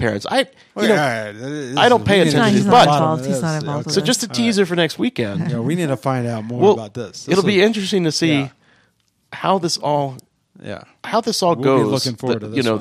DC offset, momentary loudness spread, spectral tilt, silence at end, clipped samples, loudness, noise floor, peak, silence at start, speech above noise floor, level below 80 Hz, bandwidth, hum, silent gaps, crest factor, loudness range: under 0.1%; 13 LU; -5 dB/octave; 0 s; under 0.1%; -17 LUFS; -62 dBFS; -2 dBFS; 0 s; 45 dB; -56 dBFS; 15.5 kHz; none; none; 16 dB; 6 LU